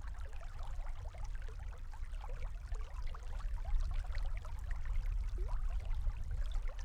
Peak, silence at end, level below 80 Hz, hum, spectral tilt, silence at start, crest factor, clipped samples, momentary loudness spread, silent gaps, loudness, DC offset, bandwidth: -24 dBFS; 0 s; -38 dBFS; none; -5.5 dB/octave; 0 s; 14 dB; under 0.1%; 7 LU; none; -45 LUFS; under 0.1%; 8.6 kHz